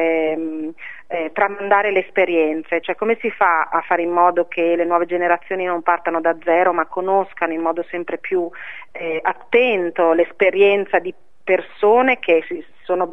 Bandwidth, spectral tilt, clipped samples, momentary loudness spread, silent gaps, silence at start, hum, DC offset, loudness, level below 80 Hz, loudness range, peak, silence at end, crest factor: 5.6 kHz; -7 dB/octave; under 0.1%; 11 LU; none; 0 s; none; 1%; -18 LUFS; -64 dBFS; 4 LU; 0 dBFS; 0 s; 18 dB